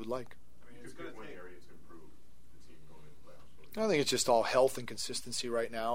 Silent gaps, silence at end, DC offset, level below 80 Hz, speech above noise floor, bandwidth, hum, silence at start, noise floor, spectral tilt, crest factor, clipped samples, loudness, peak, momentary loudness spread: none; 0 s; 0.8%; -64 dBFS; 29 dB; 16 kHz; none; 0 s; -62 dBFS; -3 dB/octave; 20 dB; under 0.1%; -32 LUFS; -14 dBFS; 24 LU